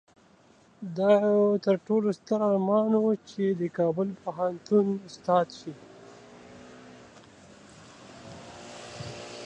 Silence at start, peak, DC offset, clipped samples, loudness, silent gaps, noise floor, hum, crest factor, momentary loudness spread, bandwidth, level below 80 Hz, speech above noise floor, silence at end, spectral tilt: 0.8 s; -10 dBFS; under 0.1%; under 0.1%; -26 LUFS; none; -59 dBFS; none; 18 dB; 23 LU; 9.2 kHz; -68 dBFS; 33 dB; 0 s; -7.5 dB/octave